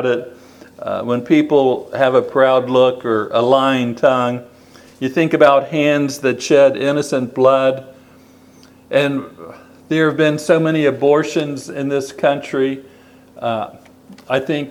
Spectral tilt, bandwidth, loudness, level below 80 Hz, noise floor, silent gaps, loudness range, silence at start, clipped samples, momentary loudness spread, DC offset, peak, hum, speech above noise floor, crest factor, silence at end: -5.5 dB/octave; 15 kHz; -16 LUFS; -64 dBFS; -45 dBFS; none; 4 LU; 0 s; under 0.1%; 12 LU; under 0.1%; 0 dBFS; none; 30 dB; 16 dB; 0 s